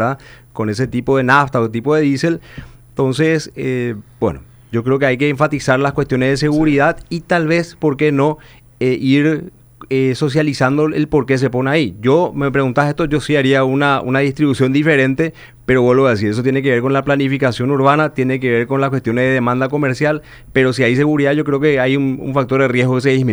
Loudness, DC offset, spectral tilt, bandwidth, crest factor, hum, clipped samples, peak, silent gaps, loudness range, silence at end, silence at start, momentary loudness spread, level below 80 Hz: -15 LUFS; under 0.1%; -7 dB/octave; over 20 kHz; 14 dB; none; under 0.1%; 0 dBFS; none; 2 LU; 0 s; 0 s; 8 LU; -44 dBFS